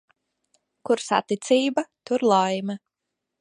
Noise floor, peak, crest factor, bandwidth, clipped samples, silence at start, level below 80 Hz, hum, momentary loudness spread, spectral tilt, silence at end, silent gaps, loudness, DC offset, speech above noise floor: -83 dBFS; -6 dBFS; 20 dB; 11 kHz; under 0.1%; 0.85 s; -78 dBFS; none; 12 LU; -4.5 dB/octave; 0.65 s; none; -23 LUFS; under 0.1%; 61 dB